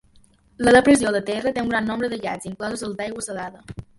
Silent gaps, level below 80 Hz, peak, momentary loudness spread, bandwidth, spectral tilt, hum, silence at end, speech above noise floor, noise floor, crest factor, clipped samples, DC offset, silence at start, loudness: none; -50 dBFS; -2 dBFS; 15 LU; 11.5 kHz; -4.5 dB/octave; none; 0.15 s; 34 dB; -55 dBFS; 20 dB; under 0.1%; under 0.1%; 0.6 s; -21 LUFS